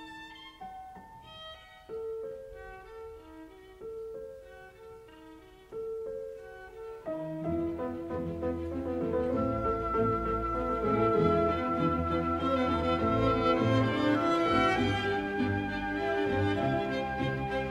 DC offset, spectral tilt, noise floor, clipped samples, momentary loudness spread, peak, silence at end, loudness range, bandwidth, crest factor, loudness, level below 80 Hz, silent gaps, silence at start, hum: under 0.1%; -7 dB/octave; -52 dBFS; under 0.1%; 20 LU; -12 dBFS; 0 s; 17 LU; 13 kHz; 18 dB; -30 LUFS; -48 dBFS; none; 0 s; none